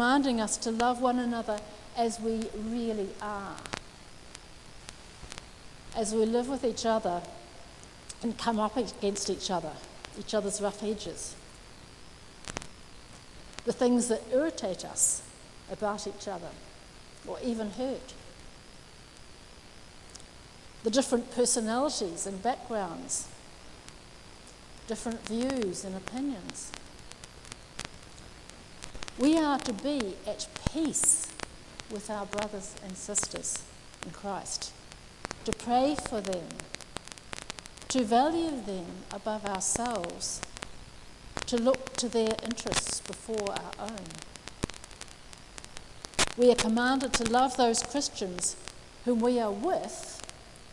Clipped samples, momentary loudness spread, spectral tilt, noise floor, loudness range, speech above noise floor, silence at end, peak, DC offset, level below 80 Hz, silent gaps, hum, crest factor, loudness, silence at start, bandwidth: under 0.1%; 23 LU; -3 dB/octave; -51 dBFS; 9 LU; 20 dB; 0 s; -10 dBFS; under 0.1%; -54 dBFS; none; none; 24 dB; -31 LUFS; 0 s; 12 kHz